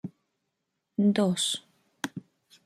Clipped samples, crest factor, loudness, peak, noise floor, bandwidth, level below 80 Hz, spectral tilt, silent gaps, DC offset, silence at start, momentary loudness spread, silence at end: under 0.1%; 20 dB; -28 LUFS; -10 dBFS; -81 dBFS; 14 kHz; -74 dBFS; -4.5 dB/octave; none; under 0.1%; 0.05 s; 17 LU; 0.45 s